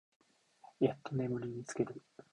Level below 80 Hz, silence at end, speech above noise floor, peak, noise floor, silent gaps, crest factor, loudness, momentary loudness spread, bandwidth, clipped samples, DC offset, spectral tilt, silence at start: -72 dBFS; 0.35 s; 26 dB; -18 dBFS; -63 dBFS; none; 22 dB; -38 LUFS; 7 LU; 11 kHz; under 0.1%; under 0.1%; -7 dB/octave; 0.65 s